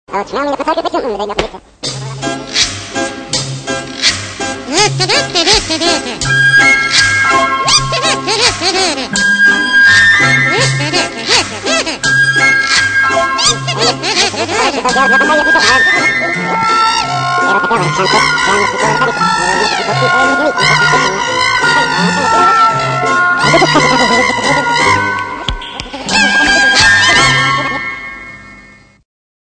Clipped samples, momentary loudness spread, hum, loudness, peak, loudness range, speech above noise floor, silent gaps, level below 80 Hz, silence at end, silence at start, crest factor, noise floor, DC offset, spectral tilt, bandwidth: under 0.1%; 12 LU; none; -10 LUFS; 0 dBFS; 4 LU; 29 dB; none; -38 dBFS; 0.85 s; 0.1 s; 12 dB; -40 dBFS; under 0.1%; -2.5 dB/octave; 11 kHz